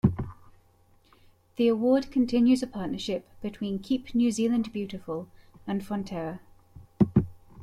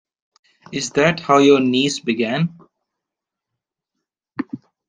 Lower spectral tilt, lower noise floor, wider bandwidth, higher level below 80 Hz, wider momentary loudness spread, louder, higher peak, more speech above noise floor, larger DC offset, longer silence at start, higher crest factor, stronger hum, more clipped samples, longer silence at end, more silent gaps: first, -7 dB/octave vs -5 dB/octave; second, -61 dBFS vs -84 dBFS; first, 12 kHz vs 9.8 kHz; first, -52 dBFS vs -60 dBFS; about the same, 15 LU vs 17 LU; second, -28 LUFS vs -17 LUFS; second, -8 dBFS vs -2 dBFS; second, 34 dB vs 68 dB; neither; second, 0.05 s vs 0.7 s; about the same, 20 dB vs 18 dB; neither; neither; second, 0 s vs 0.3 s; neither